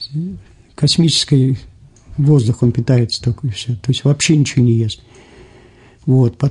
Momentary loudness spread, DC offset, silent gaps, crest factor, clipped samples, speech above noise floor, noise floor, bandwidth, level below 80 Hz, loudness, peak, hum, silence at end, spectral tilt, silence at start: 12 LU; under 0.1%; none; 12 dB; under 0.1%; 30 dB; -44 dBFS; 11 kHz; -44 dBFS; -15 LUFS; -2 dBFS; none; 0 s; -5.5 dB/octave; 0 s